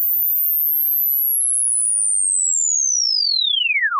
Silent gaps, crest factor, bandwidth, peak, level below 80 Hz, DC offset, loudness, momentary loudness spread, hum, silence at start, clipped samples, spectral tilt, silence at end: none; 8 dB; 15 kHz; -10 dBFS; under -90 dBFS; under 0.1%; -15 LUFS; 0 LU; none; 0 s; under 0.1%; 14 dB/octave; 0 s